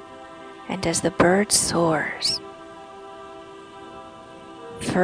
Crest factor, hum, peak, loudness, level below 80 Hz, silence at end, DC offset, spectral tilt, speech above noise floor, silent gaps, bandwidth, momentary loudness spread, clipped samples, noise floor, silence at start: 20 dB; none; -4 dBFS; -21 LUFS; -52 dBFS; 0 s; under 0.1%; -3.5 dB/octave; 21 dB; none; 10.5 kHz; 23 LU; under 0.1%; -42 dBFS; 0 s